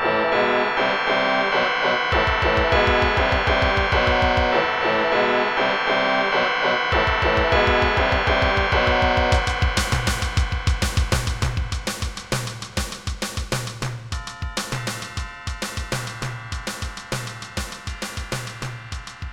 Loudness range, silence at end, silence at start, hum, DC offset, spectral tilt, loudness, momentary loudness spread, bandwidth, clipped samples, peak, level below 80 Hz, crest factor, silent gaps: 10 LU; 0 s; 0 s; none; under 0.1%; -4 dB/octave; -21 LUFS; 12 LU; 17.5 kHz; under 0.1%; -6 dBFS; -30 dBFS; 16 dB; none